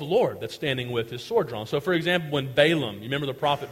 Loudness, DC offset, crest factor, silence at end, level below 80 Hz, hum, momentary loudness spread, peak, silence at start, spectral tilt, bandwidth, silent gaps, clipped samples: -25 LUFS; under 0.1%; 20 dB; 0 s; -60 dBFS; none; 8 LU; -6 dBFS; 0 s; -5.5 dB/octave; 16 kHz; none; under 0.1%